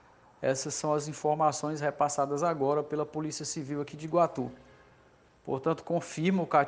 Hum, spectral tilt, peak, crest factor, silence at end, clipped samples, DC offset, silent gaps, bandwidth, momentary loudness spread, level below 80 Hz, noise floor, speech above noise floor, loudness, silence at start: none; -5 dB/octave; -10 dBFS; 20 dB; 0 s; under 0.1%; under 0.1%; none; 10 kHz; 8 LU; -70 dBFS; -61 dBFS; 31 dB; -31 LUFS; 0.4 s